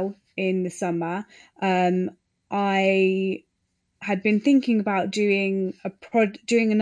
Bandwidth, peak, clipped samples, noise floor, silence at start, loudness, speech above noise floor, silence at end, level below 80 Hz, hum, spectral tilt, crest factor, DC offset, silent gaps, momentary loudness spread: 10.5 kHz; -8 dBFS; under 0.1%; -74 dBFS; 0 s; -23 LUFS; 51 dB; 0 s; -72 dBFS; none; -6 dB/octave; 14 dB; under 0.1%; none; 11 LU